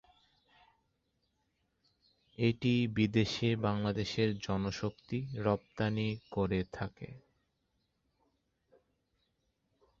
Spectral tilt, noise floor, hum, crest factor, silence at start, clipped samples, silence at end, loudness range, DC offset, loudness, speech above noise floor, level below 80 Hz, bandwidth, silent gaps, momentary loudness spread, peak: -6.5 dB/octave; -80 dBFS; none; 20 dB; 2.4 s; under 0.1%; 2.8 s; 9 LU; under 0.1%; -34 LUFS; 47 dB; -58 dBFS; 7.6 kHz; none; 10 LU; -16 dBFS